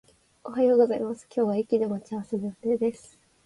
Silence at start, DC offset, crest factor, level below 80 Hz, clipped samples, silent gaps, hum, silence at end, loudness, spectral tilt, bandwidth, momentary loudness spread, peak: 0.45 s; under 0.1%; 16 dB; -68 dBFS; under 0.1%; none; none; 0.5 s; -26 LUFS; -7.5 dB/octave; 11.5 kHz; 12 LU; -10 dBFS